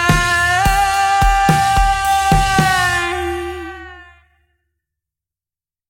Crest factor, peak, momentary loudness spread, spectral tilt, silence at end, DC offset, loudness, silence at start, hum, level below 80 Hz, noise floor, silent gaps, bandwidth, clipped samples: 16 dB; 0 dBFS; 12 LU; -3.5 dB/octave; 1.85 s; under 0.1%; -14 LUFS; 0 s; none; -26 dBFS; under -90 dBFS; none; 17 kHz; under 0.1%